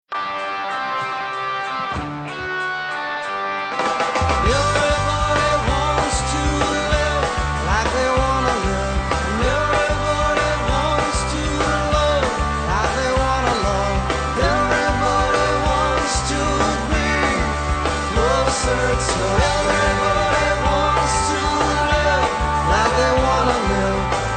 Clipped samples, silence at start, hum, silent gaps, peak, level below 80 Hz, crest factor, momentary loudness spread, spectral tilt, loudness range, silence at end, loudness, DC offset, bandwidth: under 0.1%; 0.1 s; none; none; -2 dBFS; -28 dBFS; 16 dB; 6 LU; -4 dB/octave; 3 LU; 0 s; -19 LUFS; under 0.1%; 9.6 kHz